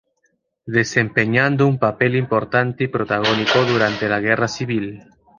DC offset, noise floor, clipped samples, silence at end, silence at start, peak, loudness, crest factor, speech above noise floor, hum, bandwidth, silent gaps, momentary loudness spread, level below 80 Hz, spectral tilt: under 0.1%; -67 dBFS; under 0.1%; 0.4 s; 0.65 s; -2 dBFS; -18 LUFS; 18 dB; 49 dB; none; 7.4 kHz; none; 6 LU; -54 dBFS; -5.5 dB/octave